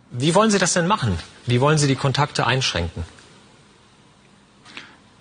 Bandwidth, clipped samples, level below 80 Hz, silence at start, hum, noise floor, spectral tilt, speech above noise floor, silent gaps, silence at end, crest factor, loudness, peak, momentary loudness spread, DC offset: 10 kHz; under 0.1%; -46 dBFS; 0.1 s; none; -52 dBFS; -4.5 dB/octave; 33 dB; none; 0.35 s; 20 dB; -19 LUFS; -2 dBFS; 22 LU; under 0.1%